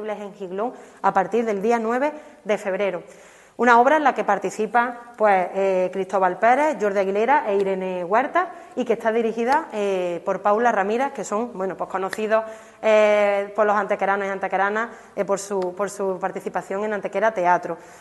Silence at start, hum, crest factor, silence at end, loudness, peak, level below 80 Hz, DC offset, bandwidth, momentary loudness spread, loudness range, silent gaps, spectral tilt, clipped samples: 0 s; none; 20 dB; 0.05 s; -22 LUFS; -2 dBFS; -68 dBFS; under 0.1%; 12.5 kHz; 10 LU; 4 LU; none; -5 dB/octave; under 0.1%